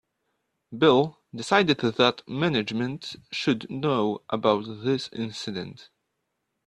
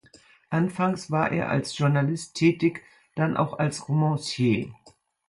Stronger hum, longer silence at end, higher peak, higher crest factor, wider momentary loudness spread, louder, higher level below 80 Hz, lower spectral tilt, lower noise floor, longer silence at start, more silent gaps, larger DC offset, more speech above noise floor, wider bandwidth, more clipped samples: neither; first, 0.85 s vs 0.4 s; first, -4 dBFS vs -8 dBFS; about the same, 22 dB vs 18 dB; first, 13 LU vs 5 LU; about the same, -25 LUFS vs -25 LUFS; about the same, -64 dBFS vs -60 dBFS; about the same, -5.5 dB/octave vs -6.5 dB/octave; first, -79 dBFS vs -56 dBFS; first, 0.7 s vs 0.5 s; neither; neither; first, 54 dB vs 31 dB; about the same, 11 kHz vs 11.5 kHz; neither